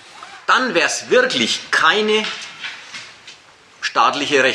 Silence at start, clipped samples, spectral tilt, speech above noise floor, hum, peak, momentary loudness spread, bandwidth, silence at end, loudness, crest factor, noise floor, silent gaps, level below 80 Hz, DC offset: 0.15 s; under 0.1%; -1.5 dB/octave; 30 dB; none; -2 dBFS; 18 LU; 13 kHz; 0 s; -16 LUFS; 18 dB; -46 dBFS; none; -68 dBFS; under 0.1%